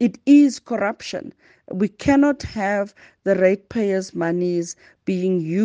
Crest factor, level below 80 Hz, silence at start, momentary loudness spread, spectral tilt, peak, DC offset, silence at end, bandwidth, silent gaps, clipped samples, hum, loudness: 16 dB; -54 dBFS; 0 s; 16 LU; -6.5 dB/octave; -4 dBFS; under 0.1%; 0 s; 9.2 kHz; none; under 0.1%; none; -20 LUFS